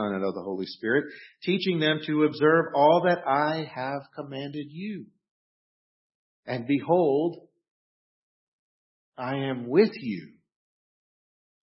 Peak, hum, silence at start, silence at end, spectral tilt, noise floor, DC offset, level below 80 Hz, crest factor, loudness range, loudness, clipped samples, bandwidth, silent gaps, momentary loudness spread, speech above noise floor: -8 dBFS; none; 0 s; 1.4 s; -10 dB/octave; under -90 dBFS; under 0.1%; -76 dBFS; 20 dB; 8 LU; -26 LUFS; under 0.1%; 5.8 kHz; 5.31-6.43 s, 7.71-9.12 s; 15 LU; over 64 dB